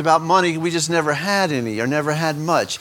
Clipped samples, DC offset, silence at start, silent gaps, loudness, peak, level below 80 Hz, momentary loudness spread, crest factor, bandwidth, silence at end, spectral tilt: under 0.1%; under 0.1%; 0 s; none; -19 LUFS; -2 dBFS; -62 dBFS; 5 LU; 18 dB; 18.5 kHz; 0 s; -4.5 dB/octave